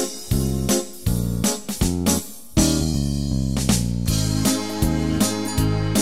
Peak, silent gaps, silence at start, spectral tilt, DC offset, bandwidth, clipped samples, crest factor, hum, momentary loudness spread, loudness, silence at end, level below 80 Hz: -4 dBFS; none; 0 s; -4.5 dB/octave; 1%; 16 kHz; under 0.1%; 16 dB; none; 4 LU; -22 LUFS; 0 s; -30 dBFS